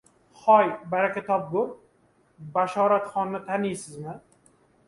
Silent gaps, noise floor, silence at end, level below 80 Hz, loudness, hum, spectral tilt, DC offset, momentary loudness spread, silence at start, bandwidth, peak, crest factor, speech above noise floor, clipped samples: none; -63 dBFS; 0.7 s; -68 dBFS; -25 LUFS; none; -6 dB/octave; under 0.1%; 17 LU; 0.45 s; 11.5 kHz; -6 dBFS; 20 dB; 39 dB; under 0.1%